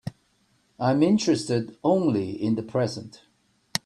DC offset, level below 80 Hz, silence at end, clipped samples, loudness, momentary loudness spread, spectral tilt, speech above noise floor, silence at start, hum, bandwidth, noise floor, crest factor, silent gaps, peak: under 0.1%; -64 dBFS; 0.1 s; under 0.1%; -24 LUFS; 13 LU; -6 dB/octave; 43 dB; 0.05 s; none; 14 kHz; -66 dBFS; 22 dB; none; -4 dBFS